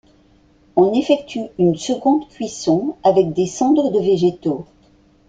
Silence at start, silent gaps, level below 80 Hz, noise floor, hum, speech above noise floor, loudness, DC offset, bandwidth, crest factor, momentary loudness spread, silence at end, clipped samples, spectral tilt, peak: 0.75 s; none; -54 dBFS; -53 dBFS; none; 36 dB; -18 LUFS; under 0.1%; 9.2 kHz; 16 dB; 8 LU; 0.65 s; under 0.1%; -6.5 dB/octave; -2 dBFS